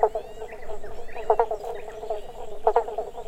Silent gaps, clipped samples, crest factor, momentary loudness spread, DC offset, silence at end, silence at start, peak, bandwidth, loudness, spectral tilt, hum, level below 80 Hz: none; under 0.1%; 20 dB; 15 LU; under 0.1%; 0 s; 0 s; -6 dBFS; 11 kHz; -28 LUFS; -5 dB/octave; none; -42 dBFS